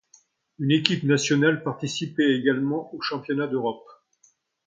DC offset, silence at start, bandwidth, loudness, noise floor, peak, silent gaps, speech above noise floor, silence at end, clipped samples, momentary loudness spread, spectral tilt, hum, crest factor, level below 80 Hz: under 0.1%; 0.6 s; 9.2 kHz; -24 LUFS; -64 dBFS; 0 dBFS; none; 40 dB; 0.75 s; under 0.1%; 9 LU; -5 dB/octave; none; 24 dB; -70 dBFS